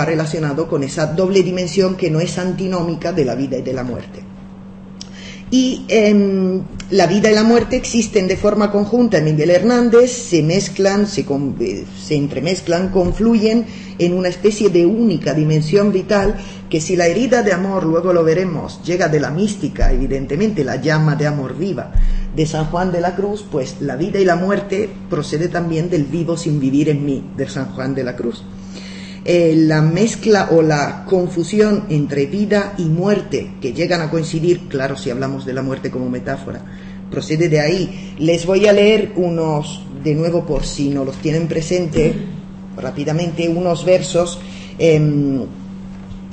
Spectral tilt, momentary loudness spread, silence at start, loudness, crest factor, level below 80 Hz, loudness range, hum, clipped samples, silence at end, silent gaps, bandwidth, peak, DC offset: -6 dB/octave; 12 LU; 0 s; -16 LUFS; 14 dB; -30 dBFS; 5 LU; none; under 0.1%; 0 s; none; 8.8 kHz; -2 dBFS; under 0.1%